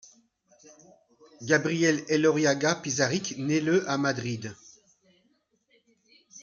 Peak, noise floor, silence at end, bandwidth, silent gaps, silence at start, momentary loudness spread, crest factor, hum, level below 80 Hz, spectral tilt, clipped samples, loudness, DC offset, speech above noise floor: -8 dBFS; -70 dBFS; 0 s; 7.6 kHz; none; 1.4 s; 11 LU; 22 dB; none; -70 dBFS; -4.5 dB/octave; under 0.1%; -26 LUFS; under 0.1%; 45 dB